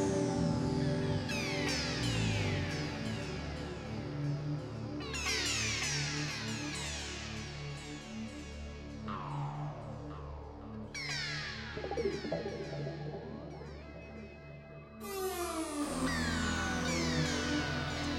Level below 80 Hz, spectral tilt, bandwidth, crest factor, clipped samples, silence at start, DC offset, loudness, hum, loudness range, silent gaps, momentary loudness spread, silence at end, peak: -50 dBFS; -4.5 dB/octave; 16 kHz; 18 dB; under 0.1%; 0 s; under 0.1%; -36 LUFS; none; 8 LU; none; 13 LU; 0 s; -20 dBFS